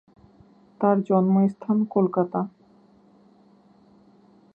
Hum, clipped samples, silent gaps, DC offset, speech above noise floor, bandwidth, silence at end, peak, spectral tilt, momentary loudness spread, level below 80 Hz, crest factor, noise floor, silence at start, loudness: none; under 0.1%; none; under 0.1%; 35 dB; 2.8 kHz; 2.05 s; -8 dBFS; -12 dB/octave; 7 LU; -70 dBFS; 18 dB; -56 dBFS; 0.8 s; -23 LUFS